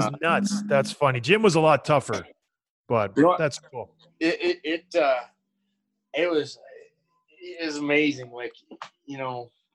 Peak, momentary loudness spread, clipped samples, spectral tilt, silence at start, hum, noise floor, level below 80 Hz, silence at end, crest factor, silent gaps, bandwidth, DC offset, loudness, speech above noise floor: -4 dBFS; 19 LU; under 0.1%; -5 dB/octave; 0 s; none; -77 dBFS; -66 dBFS; 0.3 s; 20 dB; 2.70-2.84 s; 12 kHz; under 0.1%; -24 LUFS; 53 dB